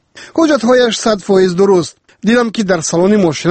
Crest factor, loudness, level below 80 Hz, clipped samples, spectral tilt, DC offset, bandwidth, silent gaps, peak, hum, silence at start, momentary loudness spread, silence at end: 12 dB; -12 LUFS; -48 dBFS; under 0.1%; -5 dB/octave; under 0.1%; 8.8 kHz; none; 0 dBFS; none; 0.15 s; 5 LU; 0 s